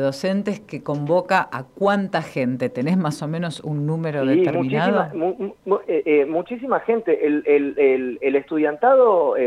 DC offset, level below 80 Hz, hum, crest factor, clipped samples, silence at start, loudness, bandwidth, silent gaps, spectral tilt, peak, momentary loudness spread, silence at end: under 0.1%; -64 dBFS; none; 16 dB; under 0.1%; 0 s; -20 LUFS; 12 kHz; none; -7.5 dB/octave; -4 dBFS; 9 LU; 0 s